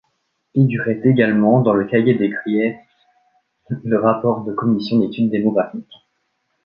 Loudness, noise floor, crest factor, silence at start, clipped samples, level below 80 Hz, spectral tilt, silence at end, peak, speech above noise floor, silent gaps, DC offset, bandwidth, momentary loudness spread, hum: -17 LUFS; -70 dBFS; 16 dB; 0.55 s; under 0.1%; -60 dBFS; -10 dB/octave; 0.85 s; -2 dBFS; 53 dB; none; under 0.1%; 5.4 kHz; 10 LU; none